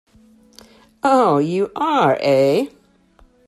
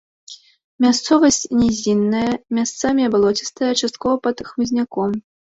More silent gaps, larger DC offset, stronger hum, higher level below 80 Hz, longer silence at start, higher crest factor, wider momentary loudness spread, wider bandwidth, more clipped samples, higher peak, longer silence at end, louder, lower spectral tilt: second, none vs 0.64-0.79 s; neither; neither; second, -60 dBFS vs -50 dBFS; first, 1.05 s vs 0.3 s; about the same, 16 dB vs 16 dB; about the same, 7 LU vs 8 LU; first, 13 kHz vs 8 kHz; neither; about the same, -4 dBFS vs -2 dBFS; first, 0.8 s vs 0.4 s; about the same, -17 LUFS vs -18 LUFS; first, -6.5 dB/octave vs -4 dB/octave